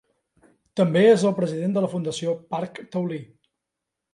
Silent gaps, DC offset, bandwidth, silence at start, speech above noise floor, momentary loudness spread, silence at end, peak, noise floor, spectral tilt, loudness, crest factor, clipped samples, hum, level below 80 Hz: none; under 0.1%; 11.5 kHz; 0.75 s; 62 dB; 14 LU; 0.9 s; -6 dBFS; -84 dBFS; -6.5 dB/octave; -23 LUFS; 18 dB; under 0.1%; none; -70 dBFS